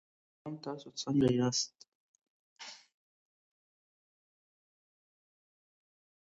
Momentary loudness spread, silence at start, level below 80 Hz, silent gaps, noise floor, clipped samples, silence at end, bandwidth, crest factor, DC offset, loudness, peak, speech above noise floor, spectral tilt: 20 LU; 0.45 s; -70 dBFS; 1.95-2.14 s, 2.28-2.56 s; under -90 dBFS; under 0.1%; 3.45 s; 8 kHz; 24 dB; under 0.1%; -33 LUFS; -16 dBFS; over 57 dB; -5.5 dB/octave